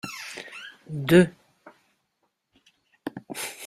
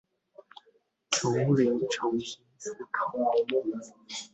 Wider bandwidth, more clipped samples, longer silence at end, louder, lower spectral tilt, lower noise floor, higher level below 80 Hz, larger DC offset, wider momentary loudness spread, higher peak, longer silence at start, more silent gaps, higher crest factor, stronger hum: first, 16 kHz vs 8.4 kHz; neither; about the same, 0 s vs 0.1 s; first, -24 LUFS vs -29 LUFS; first, -6 dB/octave vs -4.5 dB/octave; first, -75 dBFS vs -68 dBFS; first, -60 dBFS vs -70 dBFS; neither; first, 21 LU vs 15 LU; first, -4 dBFS vs -10 dBFS; second, 0.05 s vs 1.1 s; neither; about the same, 24 dB vs 20 dB; neither